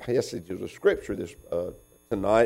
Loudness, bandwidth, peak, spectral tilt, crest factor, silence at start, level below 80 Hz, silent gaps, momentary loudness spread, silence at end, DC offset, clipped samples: -29 LUFS; 15.5 kHz; -8 dBFS; -5.5 dB/octave; 18 dB; 0 s; -52 dBFS; none; 10 LU; 0 s; under 0.1%; under 0.1%